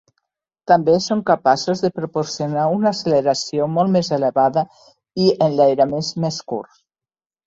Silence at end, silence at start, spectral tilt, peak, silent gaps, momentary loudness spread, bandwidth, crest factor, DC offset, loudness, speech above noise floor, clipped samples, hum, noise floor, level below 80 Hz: 0.85 s; 0.7 s; -5.5 dB/octave; -2 dBFS; none; 9 LU; 7.8 kHz; 16 dB; under 0.1%; -18 LUFS; over 72 dB; under 0.1%; none; under -90 dBFS; -58 dBFS